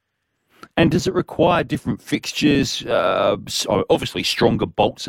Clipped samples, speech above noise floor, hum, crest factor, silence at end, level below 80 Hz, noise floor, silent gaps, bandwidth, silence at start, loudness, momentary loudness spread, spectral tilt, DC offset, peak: under 0.1%; 54 dB; none; 16 dB; 0 s; -44 dBFS; -73 dBFS; none; 17 kHz; 0.75 s; -19 LUFS; 7 LU; -5 dB/octave; under 0.1%; -4 dBFS